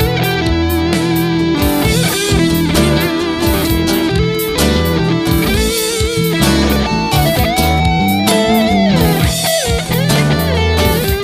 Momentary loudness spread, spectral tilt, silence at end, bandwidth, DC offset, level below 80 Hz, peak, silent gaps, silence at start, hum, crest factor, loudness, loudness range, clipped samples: 3 LU; -5 dB/octave; 0 s; 16 kHz; under 0.1%; -22 dBFS; 0 dBFS; none; 0 s; none; 12 dB; -13 LUFS; 1 LU; under 0.1%